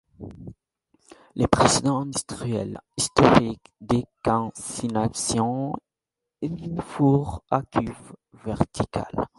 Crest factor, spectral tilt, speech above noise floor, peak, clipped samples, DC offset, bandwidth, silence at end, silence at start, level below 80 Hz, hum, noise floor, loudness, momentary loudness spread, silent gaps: 24 dB; -5 dB/octave; 62 dB; 0 dBFS; under 0.1%; under 0.1%; 11.5 kHz; 0.1 s; 0.2 s; -46 dBFS; none; -86 dBFS; -24 LUFS; 19 LU; none